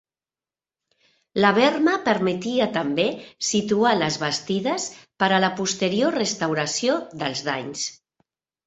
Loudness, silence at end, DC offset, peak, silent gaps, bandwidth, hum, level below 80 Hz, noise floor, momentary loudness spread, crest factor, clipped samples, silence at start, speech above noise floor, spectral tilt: -22 LUFS; 0.7 s; under 0.1%; -2 dBFS; none; 8.4 kHz; none; -64 dBFS; under -90 dBFS; 9 LU; 22 dB; under 0.1%; 1.35 s; over 68 dB; -3.5 dB/octave